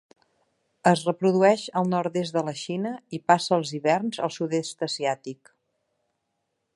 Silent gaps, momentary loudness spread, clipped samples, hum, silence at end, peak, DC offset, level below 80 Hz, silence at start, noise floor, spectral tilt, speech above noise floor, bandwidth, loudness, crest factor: none; 10 LU; under 0.1%; none; 1.4 s; -2 dBFS; under 0.1%; -74 dBFS; 0.85 s; -78 dBFS; -5.5 dB/octave; 54 dB; 11.5 kHz; -25 LUFS; 24 dB